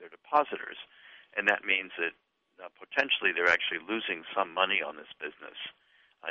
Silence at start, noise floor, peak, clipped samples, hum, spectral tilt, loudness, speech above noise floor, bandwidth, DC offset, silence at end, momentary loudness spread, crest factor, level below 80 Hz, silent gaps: 0 s; -51 dBFS; -10 dBFS; under 0.1%; none; 1.5 dB/octave; -29 LUFS; 20 dB; 8 kHz; under 0.1%; 0 s; 17 LU; 22 dB; -76 dBFS; none